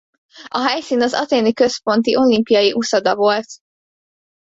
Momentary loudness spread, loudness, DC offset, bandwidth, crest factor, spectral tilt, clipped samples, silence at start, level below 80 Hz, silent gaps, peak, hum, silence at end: 6 LU; -16 LUFS; under 0.1%; 8 kHz; 14 dB; -4 dB/octave; under 0.1%; 0.35 s; -58 dBFS; none; -2 dBFS; none; 0.85 s